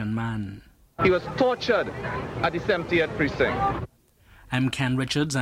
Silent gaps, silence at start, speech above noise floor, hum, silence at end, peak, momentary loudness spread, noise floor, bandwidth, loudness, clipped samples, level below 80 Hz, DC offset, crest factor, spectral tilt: none; 0 s; 31 dB; none; 0 s; -8 dBFS; 10 LU; -55 dBFS; 15 kHz; -25 LUFS; under 0.1%; -46 dBFS; under 0.1%; 18 dB; -5.5 dB/octave